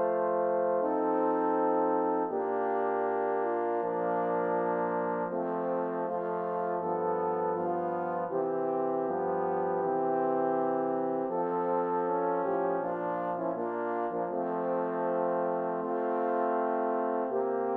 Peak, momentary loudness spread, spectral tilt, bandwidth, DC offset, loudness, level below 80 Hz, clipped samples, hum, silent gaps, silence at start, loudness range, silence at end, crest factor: -16 dBFS; 4 LU; -10.5 dB/octave; 3.8 kHz; under 0.1%; -30 LUFS; -82 dBFS; under 0.1%; none; none; 0 s; 2 LU; 0 s; 14 dB